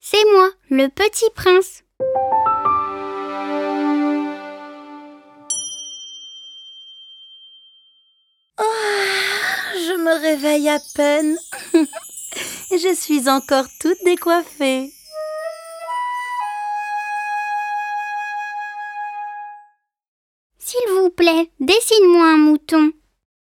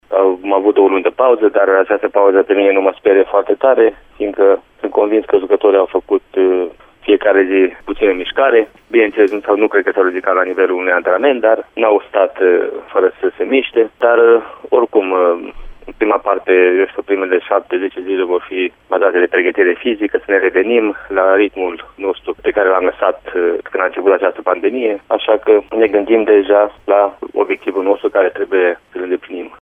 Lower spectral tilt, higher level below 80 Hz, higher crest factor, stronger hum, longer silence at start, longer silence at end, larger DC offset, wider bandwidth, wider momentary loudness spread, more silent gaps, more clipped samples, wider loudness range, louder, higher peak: second, -2 dB/octave vs -6.5 dB/octave; second, -58 dBFS vs -48 dBFS; about the same, 16 dB vs 14 dB; neither; about the same, 0.05 s vs 0.1 s; first, 0.6 s vs 0.05 s; neither; first, 17.5 kHz vs 3.7 kHz; first, 18 LU vs 7 LU; first, 20.08-20.50 s vs none; neither; first, 11 LU vs 3 LU; second, -18 LUFS vs -14 LUFS; about the same, -2 dBFS vs 0 dBFS